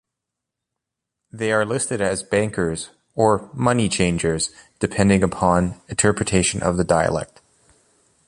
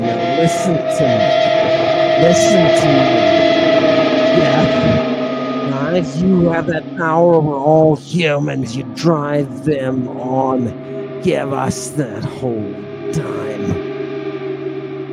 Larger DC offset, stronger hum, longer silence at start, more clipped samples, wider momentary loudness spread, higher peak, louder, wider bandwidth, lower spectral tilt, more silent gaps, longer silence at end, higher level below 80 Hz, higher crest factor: neither; neither; first, 1.35 s vs 0 s; neither; second, 8 LU vs 12 LU; about the same, -2 dBFS vs 0 dBFS; second, -20 LUFS vs -15 LUFS; about the same, 11.5 kHz vs 12.5 kHz; second, -4.5 dB/octave vs -6 dB/octave; neither; first, 1.05 s vs 0 s; about the same, -42 dBFS vs -46 dBFS; first, 20 dB vs 14 dB